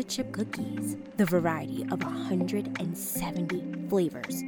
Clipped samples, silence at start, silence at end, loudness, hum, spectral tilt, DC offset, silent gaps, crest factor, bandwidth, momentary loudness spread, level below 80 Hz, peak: under 0.1%; 0 s; 0 s; -31 LUFS; none; -5.5 dB/octave; under 0.1%; none; 16 dB; 19 kHz; 7 LU; -60 dBFS; -14 dBFS